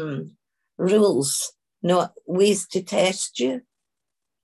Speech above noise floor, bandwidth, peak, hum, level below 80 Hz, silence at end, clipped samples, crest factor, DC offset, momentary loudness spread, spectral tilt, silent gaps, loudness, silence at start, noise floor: 64 dB; 13 kHz; -8 dBFS; none; -70 dBFS; 0.85 s; under 0.1%; 16 dB; under 0.1%; 13 LU; -4 dB/octave; none; -22 LUFS; 0 s; -86 dBFS